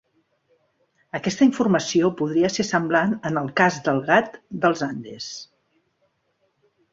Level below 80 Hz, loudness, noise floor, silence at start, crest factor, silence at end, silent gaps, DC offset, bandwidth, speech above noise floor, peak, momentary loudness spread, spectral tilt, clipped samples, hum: -62 dBFS; -21 LUFS; -70 dBFS; 1.15 s; 20 dB; 1.5 s; none; under 0.1%; 7.8 kHz; 48 dB; -2 dBFS; 14 LU; -5 dB/octave; under 0.1%; none